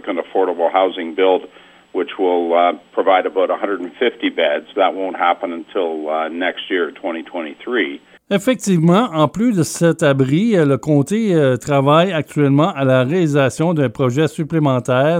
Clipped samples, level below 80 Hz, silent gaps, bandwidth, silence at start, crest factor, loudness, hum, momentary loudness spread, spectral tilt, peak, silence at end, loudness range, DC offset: under 0.1%; -58 dBFS; none; 16 kHz; 0.05 s; 14 dB; -17 LUFS; none; 8 LU; -6.5 dB/octave; -2 dBFS; 0 s; 5 LU; under 0.1%